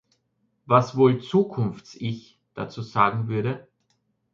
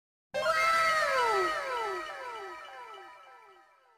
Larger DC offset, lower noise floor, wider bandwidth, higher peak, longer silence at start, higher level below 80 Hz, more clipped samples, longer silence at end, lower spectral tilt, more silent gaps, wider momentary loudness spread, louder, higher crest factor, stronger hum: neither; first, -72 dBFS vs -60 dBFS; second, 7.4 kHz vs 15.5 kHz; first, -4 dBFS vs -16 dBFS; first, 0.7 s vs 0.35 s; first, -62 dBFS vs -68 dBFS; neither; first, 0.75 s vs 0.55 s; first, -8 dB/octave vs -1.5 dB/octave; neither; second, 16 LU vs 21 LU; first, -24 LUFS vs -29 LUFS; about the same, 20 dB vs 16 dB; neither